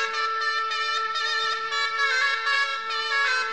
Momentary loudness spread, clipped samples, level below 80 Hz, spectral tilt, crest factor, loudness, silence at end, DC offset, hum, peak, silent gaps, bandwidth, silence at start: 3 LU; under 0.1%; -70 dBFS; 2.5 dB/octave; 16 dB; -23 LUFS; 0 s; 0.3%; none; -10 dBFS; none; 11.5 kHz; 0 s